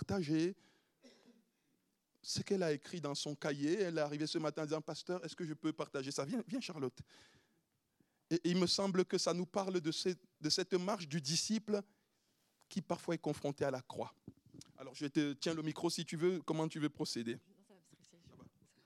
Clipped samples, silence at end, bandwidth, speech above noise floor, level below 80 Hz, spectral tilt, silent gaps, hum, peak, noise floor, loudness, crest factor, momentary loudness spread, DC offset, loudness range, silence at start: under 0.1%; 0.4 s; 14 kHz; 43 dB; -80 dBFS; -4.5 dB/octave; none; none; -20 dBFS; -81 dBFS; -39 LUFS; 20 dB; 10 LU; under 0.1%; 6 LU; 0 s